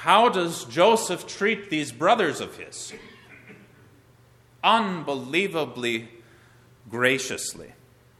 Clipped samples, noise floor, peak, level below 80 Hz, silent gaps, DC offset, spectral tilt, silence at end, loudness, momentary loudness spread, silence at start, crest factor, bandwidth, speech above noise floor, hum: under 0.1%; -56 dBFS; -4 dBFS; -66 dBFS; none; under 0.1%; -3.5 dB/octave; 0.5 s; -24 LUFS; 17 LU; 0 s; 22 dB; 15.5 kHz; 32 dB; none